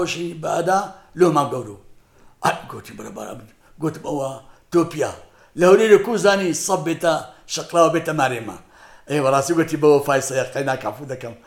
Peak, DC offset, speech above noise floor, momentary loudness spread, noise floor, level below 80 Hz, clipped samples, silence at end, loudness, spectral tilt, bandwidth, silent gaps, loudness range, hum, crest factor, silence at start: 0 dBFS; under 0.1%; 30 dB; 19 LU; -50 dBFS; -56 dBFS; under 0.1%; 0.1 s; -19 LUFS; -4.5 dB/octave; 17 kHz; none; 8 LU; none; 20 dB; 0 s